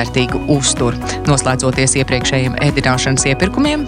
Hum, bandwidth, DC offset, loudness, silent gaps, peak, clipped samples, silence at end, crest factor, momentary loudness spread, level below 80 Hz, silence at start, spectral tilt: none; 13 kHz; under 0.1%; -14 LUFS; none; 0 dBFS; under 0.1%; 0 s; 14 dB; 3 LU; -30 dBFS; 0 s; -4 dB/octave